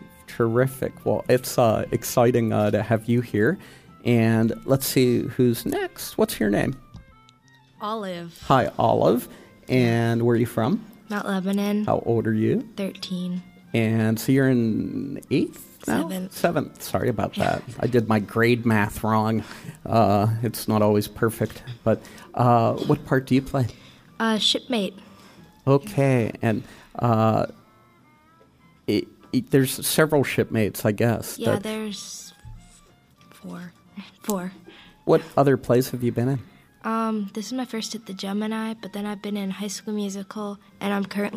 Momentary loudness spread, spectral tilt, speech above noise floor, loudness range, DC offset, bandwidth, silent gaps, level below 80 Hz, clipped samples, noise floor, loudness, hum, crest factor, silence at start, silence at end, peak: 12 LU; -6 dB/octave; 33 dB; 6 LU; under 0.1%; 15.5 kHz; none; -52 dBFS; under 0.1%; -56 dBFS; -23 LUFS; none; 18 dB; 0 s; 0 s; -4 dBFS